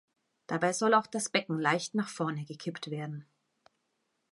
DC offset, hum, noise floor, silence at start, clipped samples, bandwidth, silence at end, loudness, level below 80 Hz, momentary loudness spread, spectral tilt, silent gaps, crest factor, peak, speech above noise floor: under 0.1%; none; -80 dBFS; 0.5 s; under 0.1%; 11.5 kHz; 1.1 s; -31 LUFS; -82 dBFS; 12 LU; -4 dB/octave; none; 22 dB; -10 dBFS; 48 dB